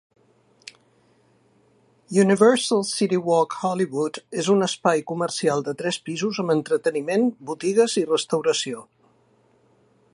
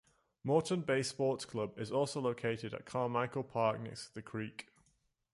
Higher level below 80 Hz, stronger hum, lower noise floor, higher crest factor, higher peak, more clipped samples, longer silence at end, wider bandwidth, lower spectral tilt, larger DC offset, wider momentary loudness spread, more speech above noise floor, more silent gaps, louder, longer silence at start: about the same, -72 dBFS vs -72 dBFS; neither; second, -61 dBFS vs -76 dBFS; about the same, 20 dB vs 20 dB; first, -2 dBFS vs -18 dBFS; neither; first, 1.3 s vs 0.75 s; about the same, 11.5 kHz vs 11.5 kHz; about the same, -4.5 dB/octave vs -5.5 dB/octave; neither; second, 9 LU vs 12 LU; about the same, 39 dB vs 40 dB; neither; first, -22 LUFS vs -37 LUFS; first, 2.1 s vs 0.45 s